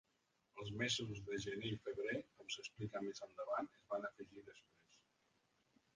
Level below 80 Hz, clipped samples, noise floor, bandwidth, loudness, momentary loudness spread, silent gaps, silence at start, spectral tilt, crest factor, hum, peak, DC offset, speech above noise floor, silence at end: -74 dBFS; under 0.1%; -83 dBFS; 9.6 kHz; -45 LUFS; 16 LU; none; 0.55 s; -4 dB/octave; 20 dB; none; -28 dBFS; under 0.1%; 37 dB; 1 s